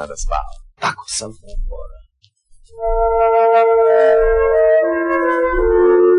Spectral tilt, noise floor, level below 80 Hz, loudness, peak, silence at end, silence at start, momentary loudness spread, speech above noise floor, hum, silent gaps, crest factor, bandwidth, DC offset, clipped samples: -4.5 dB/octave; -54 dBFS; -30 dBFS; -15 LUFS; -6 dBFS; 0 s; 0 s; 19 LU; 39 dB; none; none; 10 dB; 11 kHz; under 0.1%; under 0.1%